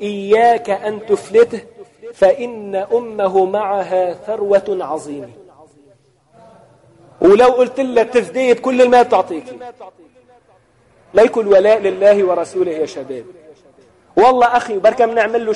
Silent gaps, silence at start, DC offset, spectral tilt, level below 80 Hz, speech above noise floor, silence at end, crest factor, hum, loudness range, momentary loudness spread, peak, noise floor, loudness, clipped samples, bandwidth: none; 0 s; under 0.1%; -5 dB/octave; -54 dBFS; 39 dB; 0 s; 14 dB; none; 5 LU; 14 LU; -2 dBFS; -53 dBFS; -14 LUFS; under 0.1%; 11.5 kHz